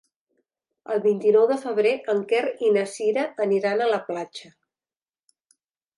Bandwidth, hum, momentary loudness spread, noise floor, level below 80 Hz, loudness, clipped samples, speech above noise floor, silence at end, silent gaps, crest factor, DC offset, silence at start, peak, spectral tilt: 11.5 kHz; none; 11 LU; under -90 dBFS; -80 dBFS; -23 LUFS; under 0.1%; over 68 dB; 1.55 s; none; 16 dB; under 0.1%; 0.9 s; -8 dBFS; -5 dB/octave